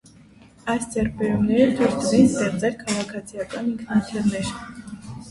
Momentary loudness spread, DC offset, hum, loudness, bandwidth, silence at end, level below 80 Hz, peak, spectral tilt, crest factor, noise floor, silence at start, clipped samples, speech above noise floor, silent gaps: 17 LU; under 0.1%; none; -22 LUFS; 11.5 kHz; 0 s; -48 dBFS; -4 dBFS; -5.5 dB/octave; 20 dB; -49 dBFS; 0.65 s; under 0.1%; 28 dB; none